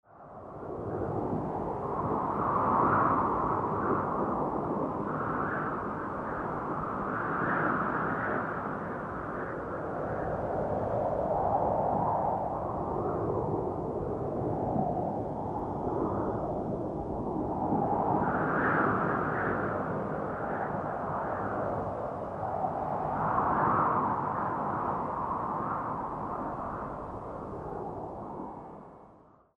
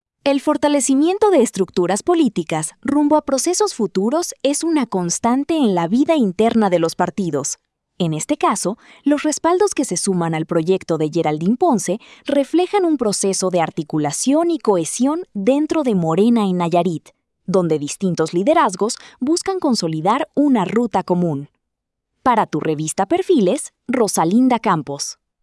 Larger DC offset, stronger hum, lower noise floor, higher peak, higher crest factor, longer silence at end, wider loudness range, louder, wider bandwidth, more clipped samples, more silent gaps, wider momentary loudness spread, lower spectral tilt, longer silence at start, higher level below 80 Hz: neither; neither; second, -58 dBFS vs -78 dBFS; second, -14 dBFS vs -4 dBFS; about the same, 18 dB vs 14 dB; about the same, 0.4 s vs 0.3 s; about the same, 4 LU vs 2 LU; second, -32 LUFS vs -18 LUFS; second, 10.5 kHz vs 12 kHz; neither; neither; first, 10 LU vs 6 LU; first, -10 dB/octave vs -5 dB/octave; second, 0.1 s vs 0.25 s; first, -52 dBFS vs -60 dBFS